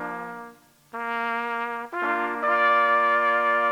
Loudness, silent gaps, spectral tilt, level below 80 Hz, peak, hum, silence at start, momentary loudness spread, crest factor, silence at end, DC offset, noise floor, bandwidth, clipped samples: -23 LUFS; none; -4 dB/octave; -78 dBFS; -8 dBFS; none; 0 s; 15 LU; 16 dB; 0 s; under 0.1%; -48 dBFS; 16 kHz; under 0.1%